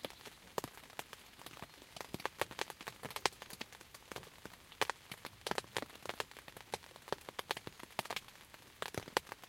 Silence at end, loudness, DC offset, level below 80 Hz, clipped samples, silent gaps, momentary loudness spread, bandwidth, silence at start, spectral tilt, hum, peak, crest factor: 0 s; -44 LUFS; under 0.1%; -70 dBFS; under 0.1%; none; 14 LU; 17 kHz; 0 s; -2.5 dB/octave; none; -6 dBFS; 38 dB